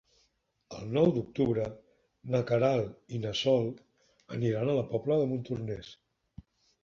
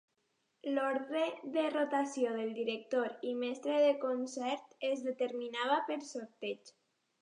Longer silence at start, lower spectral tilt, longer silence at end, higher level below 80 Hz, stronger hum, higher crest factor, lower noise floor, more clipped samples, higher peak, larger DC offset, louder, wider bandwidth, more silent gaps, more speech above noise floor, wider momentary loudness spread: about the same, 0.7 s vs 0.65 s; first, -7 dB/octave vs -3.5 dB/octave; first, 0.9 s vs 0.5 s; first, -62 dBFS vs under -90 dBFS; neither; about the same, 18 dB vs 18 dB; second, -74 dBFS vs -80 dBFS; neither; first, -12 dBFS vs -18 dBFS; neither; first, -31 LUFS vs -36 LUFS; second, 7.4 kHz vs 10.5 kHz; neither; about the same, 44 dB vs 45 dB; first, 15 LU vs 11 LU